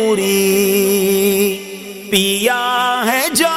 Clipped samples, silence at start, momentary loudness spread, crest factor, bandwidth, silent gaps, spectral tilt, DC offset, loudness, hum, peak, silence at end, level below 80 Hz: under 0.1%; 0 s; 5 LU; 14 dB; 16 kHz; none; -3 dB/octave; under 0.1%; -14 LUFS; none; 0 dBFS; 0 s; -54 dBFS